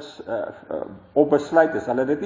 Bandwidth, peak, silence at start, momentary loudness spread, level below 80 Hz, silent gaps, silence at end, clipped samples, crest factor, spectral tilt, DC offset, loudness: 7.6 kHz; -4 dBFS; 0 s; 14 LU; -58 dBFS; none; 0 s; under 0.1%; 18 dB; -7 dB/octave; under 0.1%; -22 LUFS